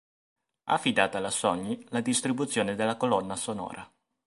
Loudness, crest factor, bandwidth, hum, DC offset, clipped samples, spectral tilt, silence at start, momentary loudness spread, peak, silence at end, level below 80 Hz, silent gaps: -28 LUFS; 24 dB; 11.5 kHz; none; under 0.1%; under 0.1%; -3.5 dB/octave; 0.65 s; 10 LU; -6 dBFS; 0.4 s; -66 dBFS; none